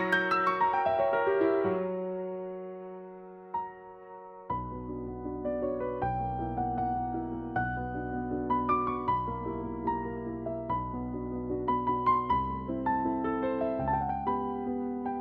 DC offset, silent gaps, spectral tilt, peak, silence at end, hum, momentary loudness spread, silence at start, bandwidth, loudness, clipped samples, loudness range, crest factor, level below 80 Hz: under 0.1%; none; -8.5 dB/octave; -12 dBFS; 0 s; none; 12 LU; 0 s; 8.2 kHz; -31 LUFS; under 0.1%; 7 LU; 18 dB; -50 dBFS